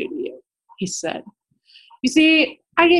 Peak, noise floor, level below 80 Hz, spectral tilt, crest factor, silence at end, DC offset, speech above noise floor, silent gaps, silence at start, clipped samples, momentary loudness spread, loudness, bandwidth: 0 dBFS; -53 dBFS; -60 dBFS; -3 dB/octave; 20 dB; 0 s; under 0.1%; 35 dB; none; 0 s; under 0.1%; 17 LU; -19 LUFS; 12 kHz